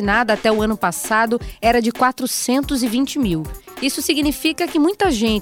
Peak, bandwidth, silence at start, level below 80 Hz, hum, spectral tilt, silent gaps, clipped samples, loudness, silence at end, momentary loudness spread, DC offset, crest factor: -2 dBFS; 17.5 kHz; 0 s; -38 dBFS; none; -3.5 dB/octave; none; under 0.1%; -18 LUFS; 0 s; 4 LU; under 0.1%; 16 dB